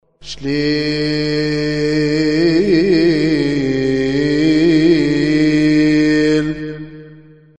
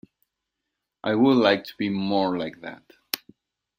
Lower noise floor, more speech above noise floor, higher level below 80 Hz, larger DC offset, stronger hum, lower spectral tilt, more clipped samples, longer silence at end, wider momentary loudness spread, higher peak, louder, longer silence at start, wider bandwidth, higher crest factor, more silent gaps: second, -41 dBFS vs -83 dBFS; second, 24 dB vs 60 dB; first, -40 dBFS vs -66 dBFS; first, 0.9% vs under 0.1%; neither; about the same, -6.5 dB/octave vs -5.5 dB/octave; neither; second, 0.4 s vs 0.6 s; second, 9 LU vs 15 LU; second, -4 dBFS vs 0 dBFS; first, -14 LUFS vs -24 LUFS; second, 0.25 s vs 1.05 s; second, 8.8 kHz vs 16 kHz; second, 12 dB vs 26 dB; neither